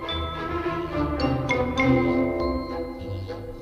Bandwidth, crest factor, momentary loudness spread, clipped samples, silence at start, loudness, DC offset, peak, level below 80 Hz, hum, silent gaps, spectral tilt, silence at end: 9.6 kHz; 16 dB; 12 LU; under 0.1%; 0 s; -26 LUFS; under 0.1%; -10 dBFS; -38 dBFS; none; none; -7 dB/octave; 0 s